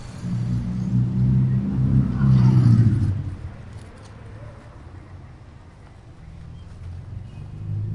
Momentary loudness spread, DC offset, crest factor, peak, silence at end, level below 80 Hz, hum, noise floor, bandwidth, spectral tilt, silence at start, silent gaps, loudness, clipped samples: 26 LU; under 0.1%; 18 dB; -4 dBFS; 0 s; -38 dBFS; none; -44 dBFS; 6.2 kHz; -9.5 dB/octave; 0 s; none; -20 LUFS; under 0.1%